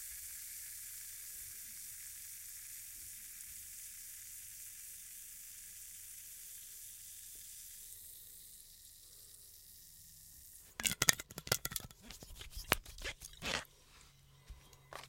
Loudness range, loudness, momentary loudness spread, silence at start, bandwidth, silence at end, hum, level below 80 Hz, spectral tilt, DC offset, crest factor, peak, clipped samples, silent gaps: 13 LU; -42 LUFS; 18 LU; 0 s; 16.5 kHz; 0 s; none; -62 dBFS; -1 dB/octave; under 0.1%; 42 dB; -4 dBFS; under 0.1%; none